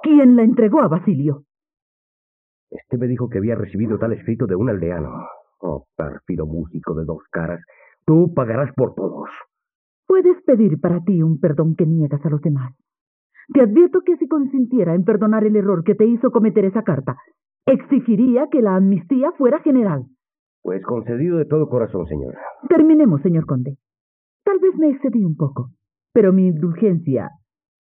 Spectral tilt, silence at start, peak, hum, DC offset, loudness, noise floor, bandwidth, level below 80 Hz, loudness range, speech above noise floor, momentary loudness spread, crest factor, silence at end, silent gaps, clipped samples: -12.5 dB/octave; 0 s; -2 dBFS; none; under 0.1%; -17 LUFS; under -90 dBFS; 3.5 kHz; -48 dBFS; 7 LU; over 73 dB; 14 LU; 16 dB; 0.5 s; 1.82-2.67 s, 9.75-10.03 s, 13.01-13.30 s, 20.39-20.63 s, 24.00-24.40 s; under 0.1%